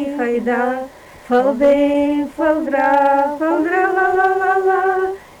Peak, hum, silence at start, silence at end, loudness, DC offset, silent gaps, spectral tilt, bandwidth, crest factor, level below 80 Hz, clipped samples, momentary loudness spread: -6 dBFS; none; 0 s; 0.2 s; -16 LUFS; under 0.1%; none; -5.5 dB/octave; 19 kHz; 12 dB; -50 dBFS; under 0.1%; 6 LU